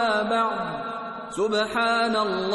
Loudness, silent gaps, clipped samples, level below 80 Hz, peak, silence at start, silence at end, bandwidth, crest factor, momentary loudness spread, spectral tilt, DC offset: -24 LUFS; none; under 0.1%; -60 dBFS; -12 dBFS; 0 s; 0 s; 12 kHz; 14 dB; 10 LU; -4 dB/octave; under 0.1%